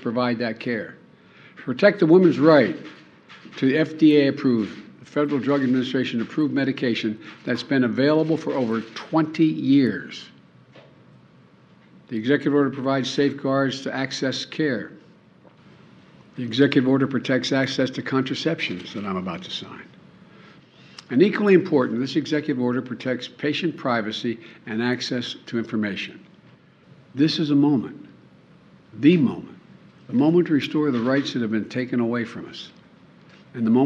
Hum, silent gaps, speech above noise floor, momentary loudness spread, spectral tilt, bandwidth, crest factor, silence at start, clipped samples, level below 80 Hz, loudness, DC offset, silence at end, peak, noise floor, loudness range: none; none; 31 dB; 15 LU; -6.5 dB/octave; 8 kHz; 20 dB; 0 s; under 0.1%; -70 dBFS; -22 LUFS; under 0.1%; 0 s; -2 dBFS; -53 dBFS; 6 LU